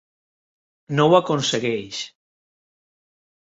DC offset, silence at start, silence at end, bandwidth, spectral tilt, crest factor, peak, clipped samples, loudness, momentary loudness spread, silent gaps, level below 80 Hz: under 0.1%; 0.9 s; 1.35 s; 8.2 kHz; -5 dB/octave; 20 dB; -2 dBFS; under 0.1%; -20 LUFS; 15 LU; none; -66 dBFS